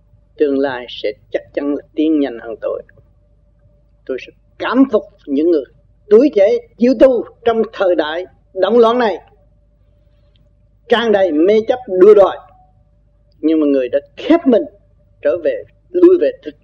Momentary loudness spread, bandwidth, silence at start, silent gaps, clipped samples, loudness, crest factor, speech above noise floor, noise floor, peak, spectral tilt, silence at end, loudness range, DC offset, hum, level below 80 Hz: 14 LU; 6.6 kHz; 0.4 s; none; under 0.1%; -14 LUFS; 16 dB; 39 dB; -52 dBFS; 0 dBFS; -6.5 dB/octave; 0.15 s; 7 LU; under 0.1%; none; -50 dBFS